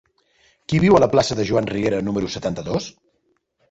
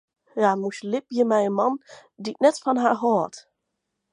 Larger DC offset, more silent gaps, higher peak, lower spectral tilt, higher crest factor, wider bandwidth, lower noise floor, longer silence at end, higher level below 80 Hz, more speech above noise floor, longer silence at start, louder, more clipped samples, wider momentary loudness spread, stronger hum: neither; neither; about the same, -2 dBFS vs -4 dBFS; about the same, -6 dB/octave vs -5.5 dB/octave; about the same, 18 dB vs 20 dB; second, 8.2 kHz vs 11 kHz; second, -68 dBFS vs -80 dBFS; about the same, 0.8 s vs 0.75 s; first, -46 dBFS vs -80 dBFS; second, 49 dB vs 57 dB; first, 0.7 s vs 0.35 s; first, -20 LUFS vs -23 LUFS; neither; about the same, 12 LU vs 13 LU; neither